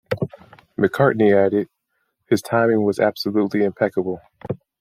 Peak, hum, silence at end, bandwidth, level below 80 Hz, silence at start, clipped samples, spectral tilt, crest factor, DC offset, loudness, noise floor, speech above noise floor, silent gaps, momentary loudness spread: -2 dBFS; none; 0.25 s; 15.5 kHz; -60 dBFS; 0.1 s; under 0.1%; -7 dB/octave; 18 dB; under 0.1%; -20 LUFS; -72 dBFS; 54 dB; none; 16 LU